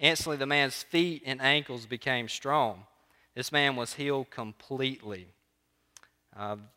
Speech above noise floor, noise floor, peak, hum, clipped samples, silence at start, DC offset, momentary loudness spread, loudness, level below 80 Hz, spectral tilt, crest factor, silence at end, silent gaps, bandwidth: 44 dB; -74 dBFS; -4 dBFS; none; under 0.1%; 0 s; under 0.1%; 16 LU; -29 LUFS; -68 dBFS; -3.5 dB/octave; 26 dB; 0.1 s; none; 16 kHz